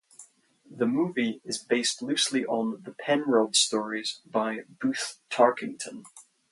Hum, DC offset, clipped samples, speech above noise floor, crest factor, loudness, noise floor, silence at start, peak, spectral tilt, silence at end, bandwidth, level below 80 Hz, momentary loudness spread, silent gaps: none; under 0.1%; under 0.1%; 30 dB; 22 dB; -27 LUFS; -57 dBFS; 0.2 s; -6 dBFS; -2.5 dB/octave; 0.3 s; 11.5 kHz; -78 dBFS; 12 LU; none